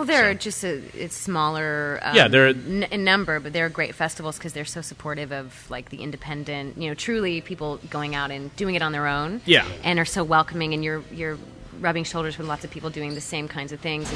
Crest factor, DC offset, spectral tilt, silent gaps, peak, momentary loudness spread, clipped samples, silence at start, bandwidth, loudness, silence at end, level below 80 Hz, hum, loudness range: 22 dB; under 0.1%; -4 dB/octave; none; -2 dBFS; 15 LU; under 0.1%; 0 s; 11 kHz; -24 LUFS; 0 s; -50 dBFS; none; 10 LU